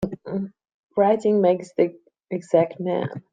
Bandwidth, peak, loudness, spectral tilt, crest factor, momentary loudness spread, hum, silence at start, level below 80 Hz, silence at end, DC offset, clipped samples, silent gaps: 9.2 kHz; -4 dBFS; -23 LUFS; -8 dB/octave; 18 dB; 12 LU; none; 0 s; -60 dBFS; 0.1 s; under 0.1%; under 0.1%; 0.74-0.87 s